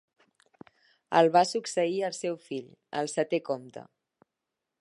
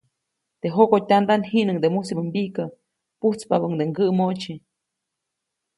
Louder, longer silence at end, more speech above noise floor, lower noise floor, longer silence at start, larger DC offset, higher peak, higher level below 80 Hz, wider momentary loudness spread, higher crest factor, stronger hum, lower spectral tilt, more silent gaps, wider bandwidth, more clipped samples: second, -28 LUFS vs -22 LUFS; second, 1 s vs 1.2 s; about the same, 58 dB vs 61 dB; first, -86 dBFS vs -82 dBFS; first, 1.1 s vs 0.65 s; neither; second, -8 dBFS vs -2 dBFS; second, -84 dBFS vs -68 dBFS; first, 17 LU vs 13 LU; about the same, 22 dB vs 20 dB; neither; second, -4.5 dB/octave vs -7 dB/octave; neither; about the same, 11.5 kHz vs 11.5 kHz; neither